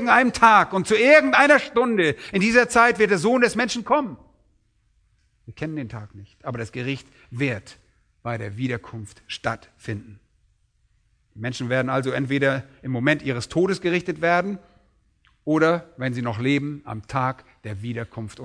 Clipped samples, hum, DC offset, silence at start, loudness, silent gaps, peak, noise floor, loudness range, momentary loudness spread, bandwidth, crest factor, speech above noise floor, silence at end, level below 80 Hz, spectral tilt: under 0.1%; none; under 0.1%; 0 s; -21 LUFS; none; 0 dBFS; -64 dBFS; 15 LU; 19 LU; 11 kHz; 22 dB; 43 dB; 0 s; -56 dBFS; -5.5 dB/octave